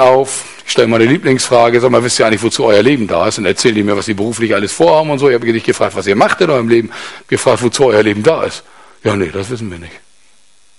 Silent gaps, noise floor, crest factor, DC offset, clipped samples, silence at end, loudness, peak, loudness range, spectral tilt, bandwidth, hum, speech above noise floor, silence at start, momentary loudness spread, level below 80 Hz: none; -52 dBFS; 12 dB; 0.6%; 0.1%; 0.8 s; -12 LUFS; 0 dBFS; 4 LU; -4.5 dB/octave; 11.5 kHz; none; 40 dB; 0 s; 11 LU; -44 dBFS